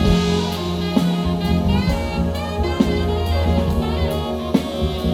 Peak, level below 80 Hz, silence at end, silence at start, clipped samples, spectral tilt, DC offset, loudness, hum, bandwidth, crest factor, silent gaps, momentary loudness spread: -2 dBFS; -26 dBFS; 0 s; 0 s; under 0.1%; -6.5 dB/octave; under 0.1%; -20 LUFS; none; 16 kHz; 16 dB; none; 4 LU